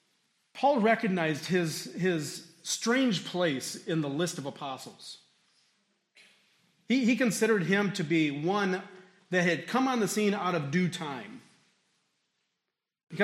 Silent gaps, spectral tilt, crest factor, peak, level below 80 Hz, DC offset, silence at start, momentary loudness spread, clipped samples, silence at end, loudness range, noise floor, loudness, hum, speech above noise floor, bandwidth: none; -4.5 dB/octave; 20 dB; -10 dBFS; -80 dBFS; under 0.1%; 0.55 s; 15 LU; under 0.1%; 0 s; 6 LU; -86 dBFS; -29 LUFS; none; 57 dB; 16 kHz